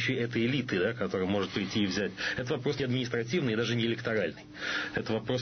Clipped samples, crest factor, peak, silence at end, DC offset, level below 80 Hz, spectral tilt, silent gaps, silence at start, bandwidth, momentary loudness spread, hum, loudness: under 0.1%; 14 dB; -18 dBFS; 0 s; under 0.1%; -60 dBFS; -5.5 dB/octave; none; 0 s; 6.6 kHz; 4 LU; none; -31 LUFS